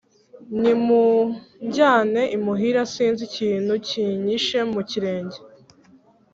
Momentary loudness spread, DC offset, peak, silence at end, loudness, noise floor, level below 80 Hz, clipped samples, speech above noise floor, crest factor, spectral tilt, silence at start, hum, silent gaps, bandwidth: 11 LU; under 0.1%; -4 dBFS; 0.85 s; -21 LUFS; -54 dBFS; -64 dBFS; under 0.1%; 34 dB; 18 dB; -5 dB/octave; 0.4 s; none; none; 7.8 kHz